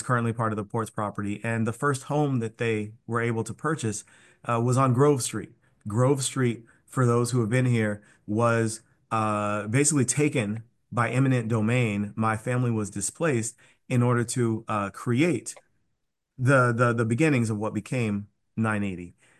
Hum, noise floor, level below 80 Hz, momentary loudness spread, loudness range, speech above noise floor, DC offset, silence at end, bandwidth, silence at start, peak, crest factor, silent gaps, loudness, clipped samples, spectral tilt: none; -78 dBFS; -60 dBFS; 9 LU; 3 LU; 53 dB; under 0.1%; 0.3 s; 12.5 kHz; 0 s; -8 dBFS; 16 dB; none; -26 LUFS; under 0.1%; -6 dB/octave